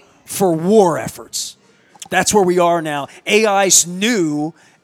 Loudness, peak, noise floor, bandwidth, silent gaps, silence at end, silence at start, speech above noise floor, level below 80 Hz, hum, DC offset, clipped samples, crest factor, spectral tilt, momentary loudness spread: -15 LUFS; 0 dBFS; -49 dBFS; 17.5 kHz; none; 0.35 s; 0.3 s; 34 dB; -54 dBFS; none; under 0.1%; under 0.1%; 16 dB; -3 dB/octave; 13 LU